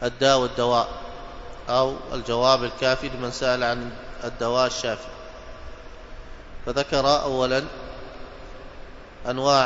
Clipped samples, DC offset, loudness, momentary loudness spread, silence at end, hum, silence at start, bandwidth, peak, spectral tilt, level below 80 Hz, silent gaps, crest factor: under 0.1%; under 0.1%; -23 LUFS; 23 LU; 0 s; none; 0 s; 8 kHz; -4 dBFS; -4 dB/octave; -42 dBFS; none; 22 dB